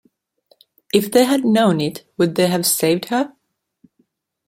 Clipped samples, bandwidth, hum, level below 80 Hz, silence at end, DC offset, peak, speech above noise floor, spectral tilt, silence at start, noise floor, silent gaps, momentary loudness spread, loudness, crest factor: under 0.1%; 16.5 kHz; none; -62 dBFS; 1.2 s; under 0.1%; -2 dBFS; 48 dB; -4.5 dB/octave; 0.95 s; -65 dBFS; none; 7 LU; -17 LUFS; 18 dB